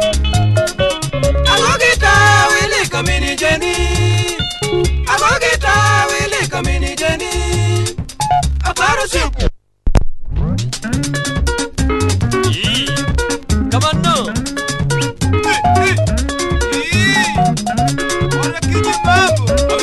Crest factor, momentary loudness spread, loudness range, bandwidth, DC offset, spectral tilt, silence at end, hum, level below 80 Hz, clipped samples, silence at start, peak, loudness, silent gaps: 14 dB; 8 LU; 5 LU; 12.5 kHz; under 0.1%; -4 dB/octave; 0 s; none; -22 dBFS; under 0.1%; 0 s; 0 dBFS; -14 LUFS; none